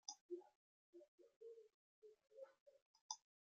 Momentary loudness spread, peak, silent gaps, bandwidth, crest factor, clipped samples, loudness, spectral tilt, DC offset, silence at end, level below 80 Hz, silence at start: 14 LU; -30 dBFS; 0.21-0.29 s, 0.55-0.93 s, 1.08-1.18 s, 1.36-1.41 s, 1.74-2.02 s, 2.60-2.66 s, 2.82-2.94 s, 3.01-3.09 s; 7.4 kHz; 32 dB; under 0.1%; -59 LUFS; 0 dB/octave; under 0.1%; 0.3 s; under -90 dBFS; 0.05 s